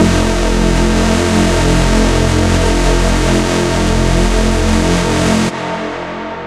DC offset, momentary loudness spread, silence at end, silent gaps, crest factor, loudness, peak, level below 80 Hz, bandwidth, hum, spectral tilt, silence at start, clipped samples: under 0.1%; 5 LU; 0 s; none; 12 dB; -13 LUFS; 0 dBFS; -18 dBFS; 13.5 kHz; none; -5 dB/octave; 0 s; under 0.1%